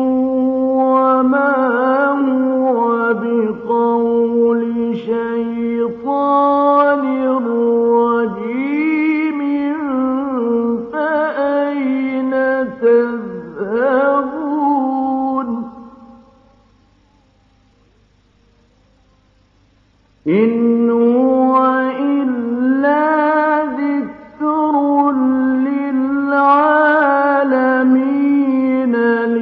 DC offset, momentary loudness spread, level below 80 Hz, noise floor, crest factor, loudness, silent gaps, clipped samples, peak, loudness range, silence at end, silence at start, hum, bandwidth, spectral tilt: under 0.1%; 7 LU; -60 dBFS; -54 dBFS; 14 dB; -15 LUFS; none; under 0.1%; 0 dBFS; 5 LU; 0 s; 0 s; none; 4.8 kHz; -9 dB/octave